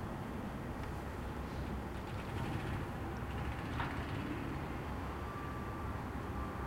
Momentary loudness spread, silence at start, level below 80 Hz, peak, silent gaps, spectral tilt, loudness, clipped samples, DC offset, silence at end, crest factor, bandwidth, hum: 3 LU; 0 s; -48 dBFS; -26 dBFS; none; -7 dB/octave; -42 LUFS; under 0.1%; under 0.1%; 0 s; 16 dB; 16 kHz; none